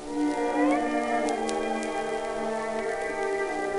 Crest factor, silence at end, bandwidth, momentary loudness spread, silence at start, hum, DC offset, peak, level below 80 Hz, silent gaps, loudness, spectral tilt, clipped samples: 18 dB; 0 s; 11.5 kHz; 6 LU; 0 s; none; under 0.1%; -10 dBFS; -54 dBFS; none; -28 LUFS; -4 dB/octave; under 0.1%